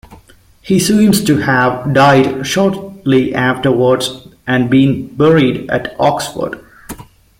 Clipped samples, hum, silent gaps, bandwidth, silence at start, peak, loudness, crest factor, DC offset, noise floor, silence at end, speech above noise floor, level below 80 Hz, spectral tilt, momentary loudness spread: under 0.1%; none; none; 16.5 kHz; 0.1 s; 0 dBFS; -13 LUFS; 12 dB; under 0.1%; -44 dBFS; 0.35 s; 32 dB; -44 dBFS; -5.5 dB/octave; 13 LU